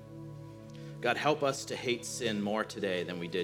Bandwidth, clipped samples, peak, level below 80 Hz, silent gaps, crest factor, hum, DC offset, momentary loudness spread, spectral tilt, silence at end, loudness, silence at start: 18 kHz; under 0.1%; -14 dBFS; -68 dBFS; none; 20 dB; none; under 0.1%; 17 LU; -4 dB/octave; 0 s; -33 LUFS; 0 s